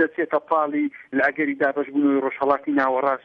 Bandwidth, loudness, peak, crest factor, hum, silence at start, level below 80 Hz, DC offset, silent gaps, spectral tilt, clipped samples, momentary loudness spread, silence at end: 5.2 kHz; -22 LUFS; -6 dBFS; 16 dB; none; 0 s; -68 dBFS; under 0.1%; none; -8 dB/octave; under 0.1%; 4 LU; 0.1 s